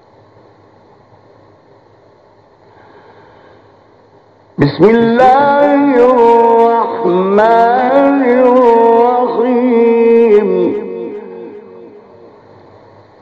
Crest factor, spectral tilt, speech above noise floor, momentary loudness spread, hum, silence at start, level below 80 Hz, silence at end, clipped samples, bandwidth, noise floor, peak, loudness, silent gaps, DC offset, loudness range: 12 dB; -8 dB/octave; 38 dB; 15 LU; none; 4.6 s; -52 dBFS; 1.35 s; under 0.1%; 6.2 kHz; -45 dBFS; 0 dBFS; -9 LUFS; none; under 0.1%; 6 LU